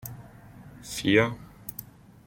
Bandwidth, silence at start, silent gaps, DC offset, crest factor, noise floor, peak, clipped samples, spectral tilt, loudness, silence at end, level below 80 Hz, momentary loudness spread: 16.5 kHz; 0.05 s; none; under 0.1%; 24 dB; -48 dBFS; -6 dBFS; under 0.1%; -5 dB/octave; -25 LUFS; 0.45 s; -56 dBFS; 25 LU